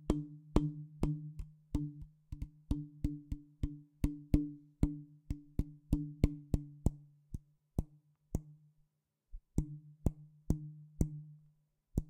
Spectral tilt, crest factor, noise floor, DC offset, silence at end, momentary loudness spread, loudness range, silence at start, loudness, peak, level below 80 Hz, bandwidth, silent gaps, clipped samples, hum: -8.5 dB/octave; 28 dB; -81 dBFS; under 0.1%; 0 s; 16 LU; 6 LU; 0 s; -40 LUFS; -10 dBFS; -44 dBFS; 16 kHz; none; under 0.1%; none